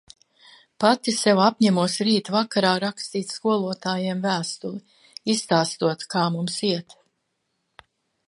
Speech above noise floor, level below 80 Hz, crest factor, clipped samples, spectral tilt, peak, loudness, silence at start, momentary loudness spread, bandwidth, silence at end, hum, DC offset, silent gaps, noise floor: 53 dB; -72 dBFS; 20 dB; under 0.1%; -4.5 dB/octave; -4 dBFS; -23 LUFS; 0.8 s; 11 LU; 11.5 kHz; 1.45 s; none; under 0.1%; none; -75 dBFS